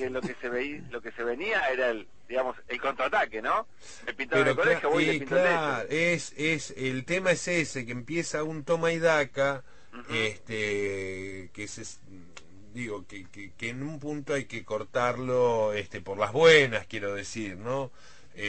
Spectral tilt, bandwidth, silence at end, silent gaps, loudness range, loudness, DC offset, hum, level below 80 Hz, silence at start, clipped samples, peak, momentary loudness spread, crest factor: -4.5 dB/octave; 8.8 kHz; 0 s; none; 10 LU; -28 LUFS; 0.5%; none; -60 dBFS; 0 s; under 0.1%; -8 dBFS; 15 LU; 22 dB